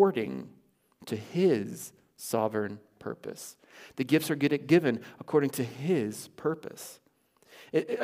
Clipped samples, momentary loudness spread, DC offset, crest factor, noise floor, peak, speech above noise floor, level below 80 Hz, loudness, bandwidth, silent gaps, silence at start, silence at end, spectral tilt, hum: under 0.1%; 19 LU; under 0.1%; 20 dB; -66 dBFS; -10 dBFS; 36 dB; -76 dBFS; -30 LUFS; 16 kHz; none; 0 s; 0 s; -6 dB/octave; none